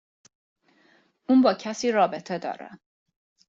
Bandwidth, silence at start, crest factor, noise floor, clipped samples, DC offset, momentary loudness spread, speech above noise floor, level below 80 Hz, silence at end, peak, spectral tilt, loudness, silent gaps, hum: 7.6 kHz; 1.3 s; 18 dB; -62 dBFS; under 0.1%; under 0.1%; 20 LU; 39 dB; -72 dBFS; 0.75 s; -8 dBFS; -5 dB/octave; -24 LUFS; none; none